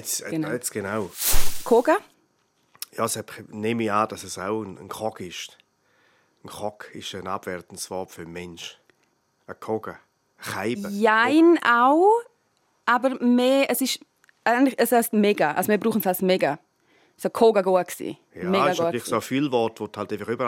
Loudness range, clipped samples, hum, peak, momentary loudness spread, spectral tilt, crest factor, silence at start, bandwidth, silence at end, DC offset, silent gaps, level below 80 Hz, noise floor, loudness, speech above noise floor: 15 LU; under 0.1%; none; -4 dBFS; 18 LU; -4 dB/octave; 18 dB; 0 s; 16.5 kHz; 0 s; under 0.1%; none; -42 dBFS; -68 dBFS; -23 LUFS; 46 dB